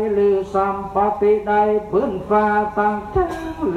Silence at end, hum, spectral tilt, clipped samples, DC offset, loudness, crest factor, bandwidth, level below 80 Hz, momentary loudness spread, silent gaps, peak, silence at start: 0 s; none; -7.5 dB/octave; under 0.1%; under 0.1%; -19 LUFS; 12 dB; 7.6 kHz; -40 dBFS; 5 LU; none; -6 dBFS; 0 s